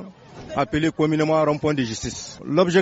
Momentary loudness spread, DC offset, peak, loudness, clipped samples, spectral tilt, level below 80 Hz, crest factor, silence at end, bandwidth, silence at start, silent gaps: 13 LU; under 0.1%; -4 dBFS; -22 LUFS; under 0.1%; -5 dB/octave; -48 dBFS; 18 dB; 0 s; 8 kHz; 0 s; none